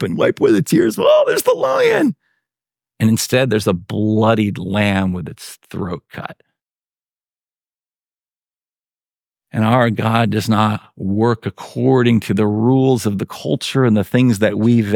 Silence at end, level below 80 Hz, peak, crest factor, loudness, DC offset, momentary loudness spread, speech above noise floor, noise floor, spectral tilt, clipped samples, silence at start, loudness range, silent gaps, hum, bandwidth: 0 s; -56 dBFS; -2 dBFS; 16 dB; -16 LUFS; under 0.1%; 13 LU; over 75 dB; under -90 dBFS; -6 dB/octave; under 0.1%; 0 s; 12 LU; 8.13-8.17 s; none; 18.5 kHz